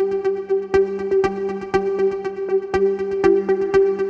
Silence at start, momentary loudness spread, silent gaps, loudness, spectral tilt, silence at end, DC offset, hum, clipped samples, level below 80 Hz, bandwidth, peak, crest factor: 0 s; 5 LU; none; -20 LUFS; -7 dB/octave; 0 s; under 0.1%; none; under 0.1%; -48 dBFS; 7.4 kHz; -2 dBFS; 16 dB